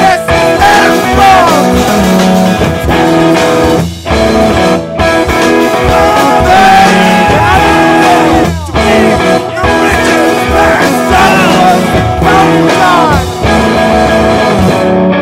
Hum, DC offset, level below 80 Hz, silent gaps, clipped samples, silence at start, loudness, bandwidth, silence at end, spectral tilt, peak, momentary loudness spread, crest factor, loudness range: none; under 0.1%; -22 dBFS; none; 2%; 0 s; -6 LUFS; 16.5 kHz; 0 s; -5 dB/octave; 0 dBFS; 5 LU; 6 dB; 2 LU